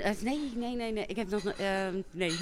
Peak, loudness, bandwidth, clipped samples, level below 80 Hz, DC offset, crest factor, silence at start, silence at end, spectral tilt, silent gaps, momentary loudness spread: -18 dBFS; -34 LUFS; 15.5 kHz; under 0.1%; -52 dBFS; under 0.1%; 14 dB; 0 s; 0 s; -4.5 dB/octave; none; 3 LU